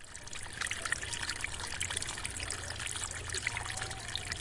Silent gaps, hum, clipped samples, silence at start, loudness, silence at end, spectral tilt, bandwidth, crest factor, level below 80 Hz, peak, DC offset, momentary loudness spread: none; none; under 0.1%; 0 s; -37 LUFS; 0 s; -1 dB/octave; 11.5 kHz; 24 dB; -52 dBFS; -16 dBFS; under 0.1%; 3 LU